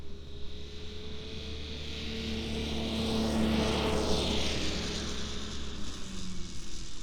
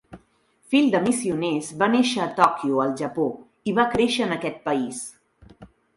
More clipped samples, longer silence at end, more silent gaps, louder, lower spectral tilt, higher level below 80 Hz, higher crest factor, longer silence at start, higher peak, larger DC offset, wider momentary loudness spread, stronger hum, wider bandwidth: neither; second, 0 s vs 0.3 s; neither; second, -34 LUFS vs -23 LUFS; about the same, -4.5 dB/octave vs -4.5 dB/octave; first, -42 dBFS vs -58 dBFS; second, 16 dB vs 22 dB; about the same, 0 s vs 0.1 s; second, -16 dBFS vs -2 dBFS; neither; first, 14 LU vs 8 LU; neither; first, 18.5 kHz vs 11.5 kHz